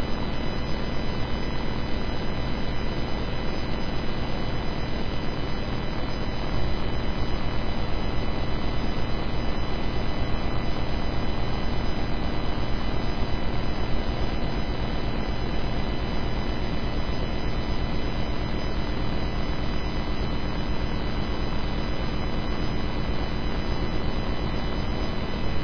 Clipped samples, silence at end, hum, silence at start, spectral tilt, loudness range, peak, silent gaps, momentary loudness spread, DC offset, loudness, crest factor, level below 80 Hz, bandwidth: under 0.1%; 0 s; 50 Hz at -35 dBFS; 0 s; -7 dB/octave; 1 LU; -10 dBFS; none; 1 LU; 2%; -30 LUFS; 14 dB; -30 dBFS; 5.4 kHz